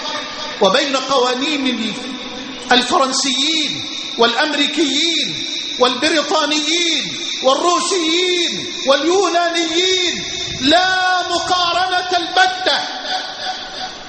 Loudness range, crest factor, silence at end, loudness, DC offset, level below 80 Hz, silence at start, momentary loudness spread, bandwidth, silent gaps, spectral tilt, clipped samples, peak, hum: 1 LU; 16 dB; 0 s; -15 LUFS; under 0.1%; -52 dBFS; 0 s; 9 LU; 8.8 kHz; none; -1.5 dB/octave; under 0.1%; 0 dBFS; none